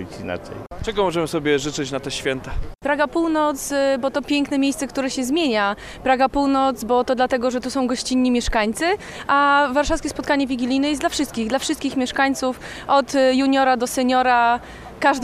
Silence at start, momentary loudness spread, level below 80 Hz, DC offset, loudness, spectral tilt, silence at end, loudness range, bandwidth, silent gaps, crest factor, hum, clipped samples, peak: 0 s; 9 LU; -38 dBFS; under 0.1%; -20 LUFS; -4 dB/octave; 0 s; 3 LU; 15.5 kHz; none; 16 dB; none; under 0.1%; -4 dBFS